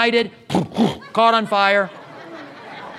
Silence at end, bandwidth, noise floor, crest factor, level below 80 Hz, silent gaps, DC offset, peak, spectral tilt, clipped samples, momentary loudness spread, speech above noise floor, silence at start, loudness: 0 s; 13 kHz; -37 dBFS; 18 dB; -58 dBFS; none; under 0.1%; -2 dBFS; -5.5 dB/octave; under 0.1%; 20 LU; 19 dB; 0 s; -18 LUFS